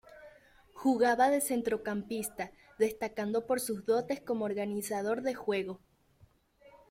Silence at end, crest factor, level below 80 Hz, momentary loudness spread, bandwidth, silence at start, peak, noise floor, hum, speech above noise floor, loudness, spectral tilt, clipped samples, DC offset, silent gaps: 1.15 s; 18 dB; -68 dBFS; 10 LU; 16.5 kHz; 0.1 s; -16 dBFS; -65 dBFS; none; 33 dB; -32 LUFS; -4.5 dB/octave; under 0.1%; under 0.1%; none